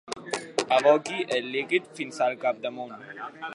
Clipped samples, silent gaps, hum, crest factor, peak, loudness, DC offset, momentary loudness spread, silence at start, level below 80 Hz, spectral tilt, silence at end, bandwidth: under 0.1%; none; none; 22 dB; -6 dBFS; -26 LUFS; under 0.1%; 17 LU; 0.1 s; -76 dBFS; -3 dB/octave; 0 s; 11.5 kHz